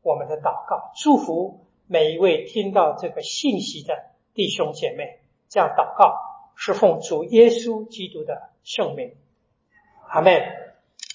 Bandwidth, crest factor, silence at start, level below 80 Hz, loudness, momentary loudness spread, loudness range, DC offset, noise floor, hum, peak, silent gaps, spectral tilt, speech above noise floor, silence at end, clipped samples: 7.6 kHz; 22 dB; 0.05 s; -72 dBFS; -21 LUFS; 16 LU; 5 LU; under 0.1%; -67 dBFS; none; 0 dBFS; none; -4.5 dB/octave; 47 dB; 0 s; under 0.1%